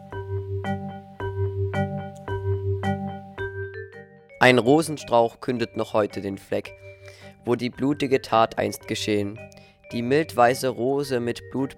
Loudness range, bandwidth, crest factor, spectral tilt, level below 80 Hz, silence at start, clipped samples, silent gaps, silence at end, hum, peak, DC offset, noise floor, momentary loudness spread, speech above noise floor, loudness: 6 LU; 16.5 kHz; 22 dB; -5.5 dB/octave; -56 dBFS; 0 s; under 0.1%; none; 0.05 s; none; -4 dBFS; under 0.1%; -45 dBFS; 15 LU; 23 dB; -24 LUFS